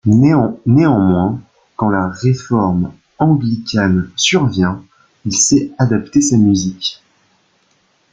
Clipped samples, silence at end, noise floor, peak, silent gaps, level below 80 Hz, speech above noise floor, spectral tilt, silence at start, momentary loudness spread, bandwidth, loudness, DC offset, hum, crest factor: under 0.1%; 1.2 s; -58 dBFS; -2 dBFS; none; -46 dBFS; 45 dB; -5 dB/octave; 0.05 s; 9 LU; 9.6 kHz; -14 LUFS; under 0.1%; none; 14 dB